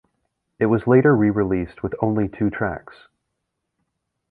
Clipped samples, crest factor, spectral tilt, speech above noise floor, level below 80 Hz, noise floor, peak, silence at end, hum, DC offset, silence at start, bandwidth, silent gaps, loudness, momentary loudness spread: under 0.1%; 18 dB; -11.5 dB/octave; 58 dB; -46 dBFS; -78 dBFS; -4 dBFS; 1.5 s; none; under 0.1%; 0.6 s; 4.6 kHz; none; -20 LUFS; 11 LU